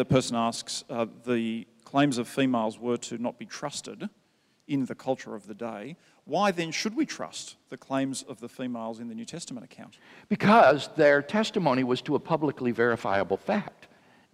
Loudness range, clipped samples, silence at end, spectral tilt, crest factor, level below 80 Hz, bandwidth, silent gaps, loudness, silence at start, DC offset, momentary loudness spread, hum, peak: 10 LU; under 0.1%; 0.5 s; -5 dB/octave; 22 dB; -66 dBFS; 15 kHz; none; -27 LUFS; 0 s; under 0.1%; 18 LU; none; -6 dBFS